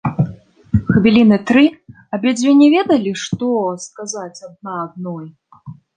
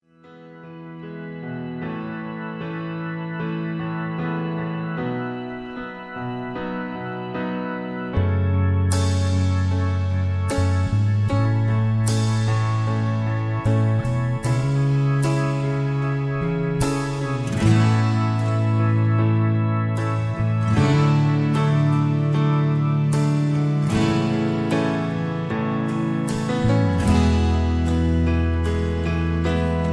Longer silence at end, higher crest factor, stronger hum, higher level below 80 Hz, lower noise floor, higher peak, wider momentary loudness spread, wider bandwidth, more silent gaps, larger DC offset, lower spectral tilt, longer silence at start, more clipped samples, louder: first, 0.25 s vs 0 s; about the same, 14 dB vs 16 dB; neither; second, -42 dBFS vs -36 dBFS; second, -38 dBFS vs -46 dBFS; first, -2 dBFS vs -6 dBFS; first, 17 LU vs 11 LU; second, 9.6 kHz vs 11 kHz; neither; neither; second, -6 dB/octave vs -7.5 dB/octave; second, 0.05 s vs 0.25 s; neither; first, -15 LUFS vs -22 LUFS